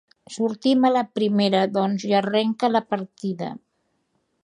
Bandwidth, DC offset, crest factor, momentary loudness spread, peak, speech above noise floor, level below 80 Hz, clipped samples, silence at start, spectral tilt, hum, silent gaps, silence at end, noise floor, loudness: 10.5 kHz; under 0.1%; 16 dB; 12 LU; -6 dBFS; 50 dB; -72 dBFS; under 0.1%; 0.3 s; -6 dB/octave; none; none; 0.9 s; -71 dBFS; -22 LUFS